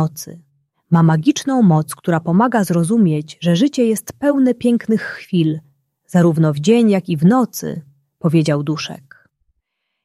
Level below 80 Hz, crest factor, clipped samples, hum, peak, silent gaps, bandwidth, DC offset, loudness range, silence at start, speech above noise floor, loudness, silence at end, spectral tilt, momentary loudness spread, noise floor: -60 dBFS; 14 dB; under 0.1%; none; -2 dBFS; none; 14.5 kHz; under 0.1%; 2 LU; 0 s; 58 dB; -16 LUFS; 1.1 s; -6.5 dB/octave; 10 LU; -73 dBFS